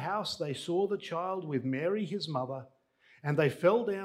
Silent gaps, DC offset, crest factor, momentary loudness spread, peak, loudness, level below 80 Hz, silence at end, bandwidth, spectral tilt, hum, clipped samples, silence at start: none; under 0.1%; 20 dB; 9 LU; -12 dBFS; -32 LUFS; -76 dBFS; 0 s; 15 kHz; -6 dB/octave; none; under 0.1%; 0 s